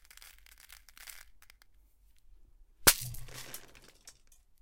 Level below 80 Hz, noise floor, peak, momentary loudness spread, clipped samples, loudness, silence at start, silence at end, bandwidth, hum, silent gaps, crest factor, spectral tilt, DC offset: -54 dBFS; -63 dBFS; -4 dBFS; 29 LU; under 0.1%; -28 LUFS; 0.25 s; 0.5 s; 17 kHz; none; none; 34 dB; -1 dB/octave; under 0.1%